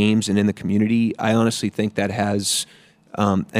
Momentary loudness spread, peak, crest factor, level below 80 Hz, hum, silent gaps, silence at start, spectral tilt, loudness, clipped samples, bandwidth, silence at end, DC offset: 5 LU; -4 dBFS; 16 dB; -62 dBFS; none; none; 0 s; -5 dB/octave; -20 LUFS; under 0.1%; 16 kHz; 0 s; under 0.1%